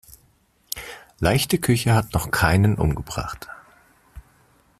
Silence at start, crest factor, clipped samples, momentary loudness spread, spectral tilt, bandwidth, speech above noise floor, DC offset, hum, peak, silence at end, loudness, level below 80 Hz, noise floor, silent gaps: 0.75 s; 20 dB; under 0.1%; 15 LU; -5 dB/octave; 15 kHz; 41 dB; under 0.1%; none; -2 dBFS; 0.6 s; -22 LUFS; -40 dBFS; -61 dBFS; none